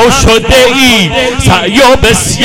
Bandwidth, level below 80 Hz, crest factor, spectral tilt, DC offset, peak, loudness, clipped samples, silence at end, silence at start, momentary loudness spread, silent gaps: 17.5 kHz; -20 dBFS; 6 dB; -3.5 dB/octave; under 0.1%; 0 dBFS; -5 LUFS; 0.5%; 0 s; 0 s; 4 LU; none